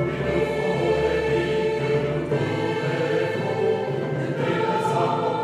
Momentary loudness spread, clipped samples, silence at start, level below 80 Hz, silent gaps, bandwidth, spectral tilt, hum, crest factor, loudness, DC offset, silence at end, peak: 3 LU; under 0.1%; 0 s; -46 dBFS; none; 12 kHz; -7 dB/octave; none; 12 dB; -23 LUFS; under 0.1%; 0 s; -10 dBFS